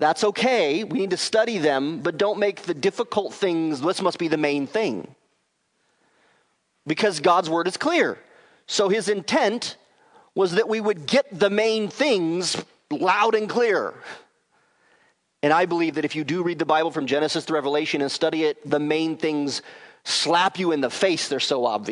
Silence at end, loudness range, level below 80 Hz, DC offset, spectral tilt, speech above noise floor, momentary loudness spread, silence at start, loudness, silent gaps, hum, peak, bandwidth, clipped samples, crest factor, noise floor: 0 s; 3 LU; -76 dBFS; under 0.1%; -4 dB/octave; 48 dB; 6 LU; 0 s; -23 LUFS; none; none; -4 dBFS; 11 kHz; under 0.1%; 20 dB; -70 dBFS